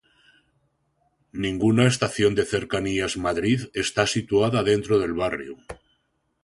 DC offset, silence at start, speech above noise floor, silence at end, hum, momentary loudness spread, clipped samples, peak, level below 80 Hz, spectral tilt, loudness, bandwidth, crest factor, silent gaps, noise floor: under 0.1%; 1.35 s; 48 dB; 0.7 s; none; 15 LU; under 0.1%; -4 dBFS; -50 dBFS; -5 dB/octave; -23 LUFS; 11.5 kHz; 20 dB; none; -71 dBFS